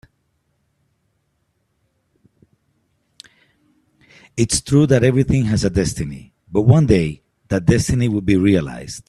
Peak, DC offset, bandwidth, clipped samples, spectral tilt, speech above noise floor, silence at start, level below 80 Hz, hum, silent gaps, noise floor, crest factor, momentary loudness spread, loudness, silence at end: 0 dBFS; under 0.1%; 13 kHz; under 0.1%; -6 dB/octave; 52 dB; 4.35 s; -40 dBFS; none; none; -68 dBFS; 18 dB; 14 LU; -17 LUFS; 0.1 s